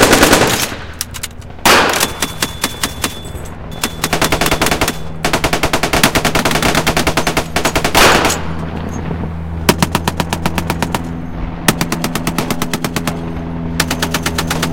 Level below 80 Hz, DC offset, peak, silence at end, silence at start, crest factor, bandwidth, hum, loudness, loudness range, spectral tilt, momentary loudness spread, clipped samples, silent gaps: -28 dBFS; 2%; 0 dBFS; 0 s; 0 s; 16 dB; over 20 kHz; none; -15 LUFS; 5 LU; -3.5 dB/octave; 13 LU; 0.1%; none